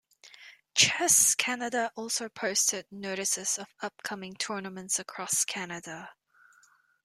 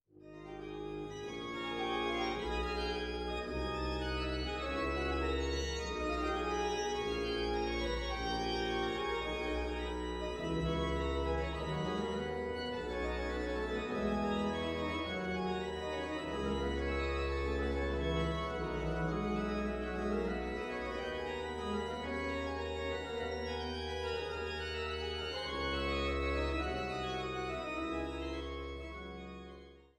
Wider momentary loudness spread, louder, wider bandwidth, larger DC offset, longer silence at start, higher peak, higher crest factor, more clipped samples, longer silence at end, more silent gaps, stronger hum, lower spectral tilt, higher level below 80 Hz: first, 17 LU vs 5 LU; first, -27 LUFS vs -37 LUFS; first, 16 kHz vs 11 kHz; neither; about the same, 0.25 s vs 0.15 s; first, -6 dBFS vs -22 dBFS; first, 24 dB vs 14 dB; neither; first, 0.9 s vs 0.15 s; neither; neither; second, -0.5 dB/octave vs -5.5 dB/octave; second, -74 dBFS vs -44 dBFS